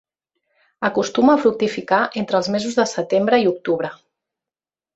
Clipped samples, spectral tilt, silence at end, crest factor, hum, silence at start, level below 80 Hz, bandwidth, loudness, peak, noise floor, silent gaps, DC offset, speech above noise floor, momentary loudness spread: under 0.1%; -5 dB/octave; 1 s; 18 dB; none; 0.8 s; -62 dBFS; 8.2 kHz; -19 LUFS; -2 dBFS; under -90 dBFS; none; under 0.1%; over 72 dB; 8 LU